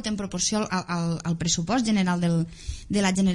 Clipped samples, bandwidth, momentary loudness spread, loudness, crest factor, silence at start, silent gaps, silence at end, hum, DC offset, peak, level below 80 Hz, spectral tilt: under 0.1%; 11.5 kHz; 6 LU; -25 LUFS; 14 dB; 0 s; none; 0 s; none; under 0.1%; -12 dBFS; -44 dBFS; -4.5 dB/octave